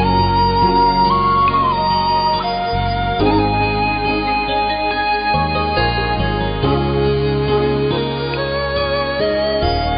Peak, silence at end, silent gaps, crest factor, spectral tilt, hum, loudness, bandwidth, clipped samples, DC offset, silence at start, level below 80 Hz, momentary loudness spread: -2 dBFS; 0 s; none; 12 dB; -11 dB/octave; none; -16 LUFS; 5.2 kHz; under 0.1%; under 0.1%; 0 s; -28 dBFS; 5 LU